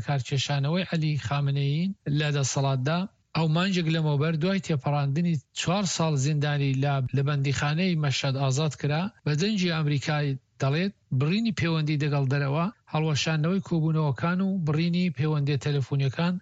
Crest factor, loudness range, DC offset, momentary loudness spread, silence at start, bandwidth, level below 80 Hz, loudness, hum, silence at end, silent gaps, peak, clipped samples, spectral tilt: 14 dB; 1 LU; under 0.1%; 3 LU; 0 s; 8 kHz; -60 dBFS; -26 LUFS; none; 0 s; none; -12 dBFS; under 0.1%; -6 dB/octave